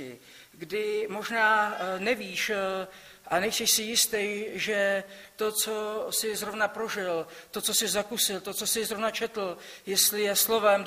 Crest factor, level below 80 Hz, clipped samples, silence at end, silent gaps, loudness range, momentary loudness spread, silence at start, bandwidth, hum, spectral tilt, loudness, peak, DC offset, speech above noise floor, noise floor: 20 dB; -68 dBFS; under 0.1%; 0 s; none; 3 LU; 11 LU; 0 s; 15.5 kHz; none; -1 dB/octave; -27 LUFS; -10 dBFS; under 0.1%; 21 dB; -50 dBFS